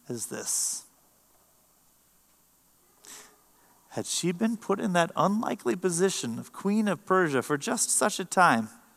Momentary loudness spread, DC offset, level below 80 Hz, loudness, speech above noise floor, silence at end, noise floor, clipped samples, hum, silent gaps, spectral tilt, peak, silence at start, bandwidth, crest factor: 14 LU; under 0.1%; -78 dBFS; -27 LUFS; 37 dB; 0.25 s; -64 dBFS; under 0.1%; none; none; -3.5 dB/octave; -8 dBFS; 0.1 s; 15 kHz; 22 dB